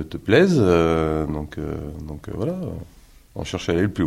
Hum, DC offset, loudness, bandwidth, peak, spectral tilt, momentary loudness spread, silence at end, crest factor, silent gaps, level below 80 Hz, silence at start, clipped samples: none; under 0.1%; -21 LUFS; 15.5 kHz; -2 dBFS; -7 dB/octave; 17 LU; 0 s; 20 dB; none; -42 dBFS; 0 s; under 0.1%